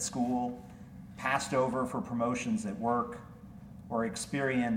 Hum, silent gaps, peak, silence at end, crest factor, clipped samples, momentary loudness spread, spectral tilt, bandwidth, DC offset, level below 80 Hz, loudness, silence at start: none; none; -16 dBFS; 0 s; 18 dB; under 0.1%; 19 LU; -5 dB/octave; 16 kHz; under 0.1%; -60 dBFS; -33 LUFS; 0 s